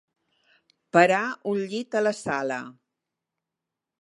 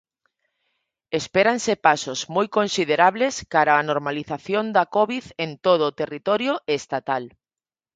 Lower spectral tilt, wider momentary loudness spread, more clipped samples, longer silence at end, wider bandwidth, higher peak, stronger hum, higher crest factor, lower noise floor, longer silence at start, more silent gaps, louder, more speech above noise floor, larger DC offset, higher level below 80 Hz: about the same, -5 dB/octave vs -4 dB/octave; about the same, 12 LU vs 10 LU; neither; first, 1.3 s vs 0.65 s; first, 11.5 kHz vs 9.4 kHz; about the same, -2 dBFS vs -2 dBFS; neither; about the same, 24 dB vs 20 dB; about the same, -87 dBFS vs under -90 dBFS; second, 0.95 s vs 1.1 s; neither; second, -25 LUFS vs -22 LUFS; second, 62 dB vs over 69 dB; neither; second, -72 dBFS vs -62 dBFS